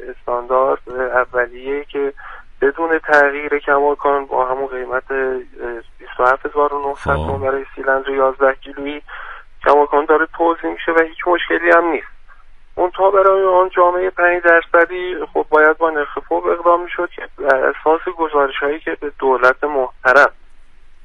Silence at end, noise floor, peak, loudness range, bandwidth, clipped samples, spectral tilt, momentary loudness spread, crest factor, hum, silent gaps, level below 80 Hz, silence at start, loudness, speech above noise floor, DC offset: 0.15 s; -39 dBFS; 0 dBFS; 5 LU; 9.4 kHz; under 0.1%; -6 dB/octave; 12 LU; 16 dB; none; none; -40 dBFS; 0 s; -16 LUFS; 22 dB; under 0.1%